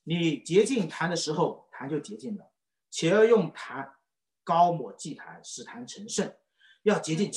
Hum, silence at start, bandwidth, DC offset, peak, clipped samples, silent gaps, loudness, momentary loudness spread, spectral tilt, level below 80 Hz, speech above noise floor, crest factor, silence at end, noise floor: none; 0.05 s; 11.5 kHz; under 0.1%; -10 dBFS; under 0.1%; none; -27 LUFS; 18 LU; -5 dB/octave; -76 dBFS; 42 dB; 18 dB; 0 s; -69 dBFS